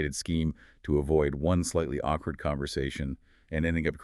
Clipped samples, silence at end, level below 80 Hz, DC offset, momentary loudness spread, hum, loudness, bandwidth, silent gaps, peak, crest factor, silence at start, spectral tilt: under 0.1%; 0 s; -40 dBFS; under 0.1%; 10 LU; none; -30 LUFS; 13 kHz; none; -12 dBFS; 18 dB; 0 s; -6 dB/octave